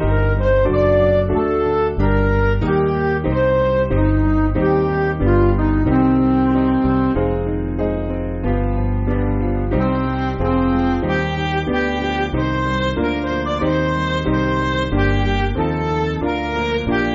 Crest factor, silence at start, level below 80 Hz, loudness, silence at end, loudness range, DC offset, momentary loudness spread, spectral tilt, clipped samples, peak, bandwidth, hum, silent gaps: 14 dB; 0 s; -26 dBFS; -18 LUFS; 0 s; 3 LU; under 0.1%; 5 LU; -6.5 dB/octave; under 0.1%; -4 dBFS; 7.4 kHz; none; none